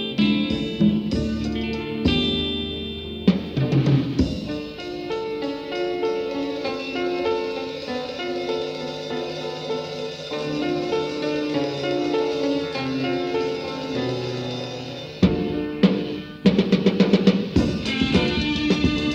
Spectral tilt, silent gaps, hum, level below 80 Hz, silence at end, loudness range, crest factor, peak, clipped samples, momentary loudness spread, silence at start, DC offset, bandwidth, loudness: -6.5 dB/octave; none; none; -40 dBFS; 0 s; 6 LU; 20 dB; -2 dBFS; under 0.1%; 9 LU; 0 s; under 0.1%; 8.8 kHz; -23 LUFS